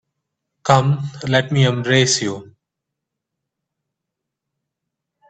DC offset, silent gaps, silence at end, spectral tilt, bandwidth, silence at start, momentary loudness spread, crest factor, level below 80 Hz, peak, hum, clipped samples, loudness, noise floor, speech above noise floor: under 0.1%; none; 2.85 s; -4.5 dB/octave; 9 kHz; 0.65 s; 12 LU; 22 dB; -58 dBFS; 0 dBFS; none; under 0.1%; -17 LUFS; -81 dBFS; 65 dB